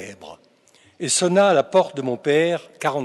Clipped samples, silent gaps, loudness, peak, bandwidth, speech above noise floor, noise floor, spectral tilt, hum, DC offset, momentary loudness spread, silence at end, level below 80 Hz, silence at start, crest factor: under 0.1%; none; -19 LUFS; -4 dBFS; 12 kHz; 37 dB; -56 dBFS; -3.5 dB/octave; none; under 0.1%; 9 LU; 0 s; -74 dBFS; 0 s; 16 dB